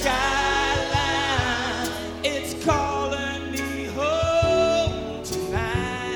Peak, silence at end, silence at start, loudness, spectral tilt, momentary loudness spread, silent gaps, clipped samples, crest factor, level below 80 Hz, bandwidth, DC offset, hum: -8 dBFS; 0 s; 0 s; -24 LUFS; -4 dB/octave; 8 LU; none; under 0.1%; 16 dB; -38 dBFS; 18 kHz; under 0.1%; none